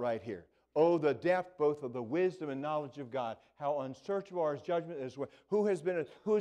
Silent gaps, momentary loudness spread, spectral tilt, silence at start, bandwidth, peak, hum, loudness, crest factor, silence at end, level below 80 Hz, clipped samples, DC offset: none; 10 LU; -7.5 dB/octave; 0 s; 9.8 kHz; -16 dBFS; none; -35 LUFS; 18 dB; 0 s; -78 dBFS; under 0.1%; under 0.1%